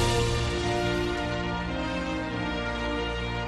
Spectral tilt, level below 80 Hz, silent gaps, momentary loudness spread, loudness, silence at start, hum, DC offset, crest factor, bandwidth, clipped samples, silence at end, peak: -5 dB/octave; -36 dBFS; none; 4 LU; -29 LUFS; 0 s; none; under 0.1%; 16 dB; 13 kHz; under 0.1%; 0 s; -12 dBFS